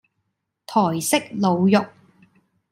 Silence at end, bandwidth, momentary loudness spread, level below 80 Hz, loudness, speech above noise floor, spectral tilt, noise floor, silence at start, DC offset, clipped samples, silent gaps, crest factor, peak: 0.85 s; 16 kHz; 5 LU; -68 dBFS; -20 LUFS; 56 dB; -5 dB/octave; -76 dBFS; 0.7 s; under 0.1%; under 0.1%; none; 18 dB; -4 dBFS